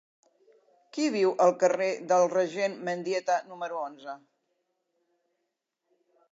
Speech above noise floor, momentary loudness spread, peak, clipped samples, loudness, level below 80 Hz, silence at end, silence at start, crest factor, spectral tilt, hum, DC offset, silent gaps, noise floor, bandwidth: 55 dB; 16 LU; -10 dBFS; under 0.1%; -27 LUFS; -90 dBFS; 2.15 s; 0.95 s; 20 dB; -4.5 dB/octave; none; under 0.1%; none; -82 dBFS; 7.8 kHz